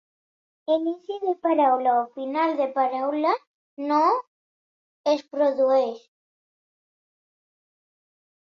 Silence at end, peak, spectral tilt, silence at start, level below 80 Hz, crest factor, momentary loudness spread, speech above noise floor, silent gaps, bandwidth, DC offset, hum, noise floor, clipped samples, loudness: 2.55 s; -10 dBFS; -4 dB/octave; 0.7 s; -78 dBFS; 16 dB; 10 LU; over 67 dB; 3.47-3.77 s, 4.28-5.04 s; 7 kHz; under 0.1%; none; under -90 dBFS; under 0.1%; -24 LUFS